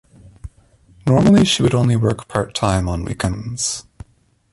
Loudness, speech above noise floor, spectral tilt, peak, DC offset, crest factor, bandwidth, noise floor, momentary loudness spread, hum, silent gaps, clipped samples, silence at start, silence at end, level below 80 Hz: -17 LUFS; 41 dB; -5.5 dB/octave; -2 dBFS; under 0.1%; 18 dB; 11.5 kHz; -57 dBFS; 11 LU; none; none; under 0.1%; 0.45 s; 0.7 s; -36 dBFS